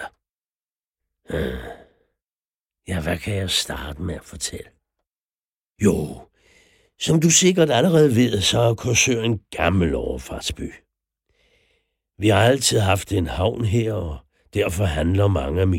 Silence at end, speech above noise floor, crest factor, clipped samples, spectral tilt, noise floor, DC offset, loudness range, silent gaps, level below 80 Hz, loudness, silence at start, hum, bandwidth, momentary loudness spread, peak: 0 s; over 70 dB; 18 dB; under 0.1%; -4.5 dB/octave; under -90 dBFS; under 0.1%; 10 LU; 0.30-0.39 s, 0.48-0.80 s, 0.87-0.94 s, 2.24-2.70 s, 5.07-5.11 s, 5.23-5.71 s; -42 dBFS; -20 LUFS; 0 s; none; 16.5 kHz; 15 LU; -4 dBFS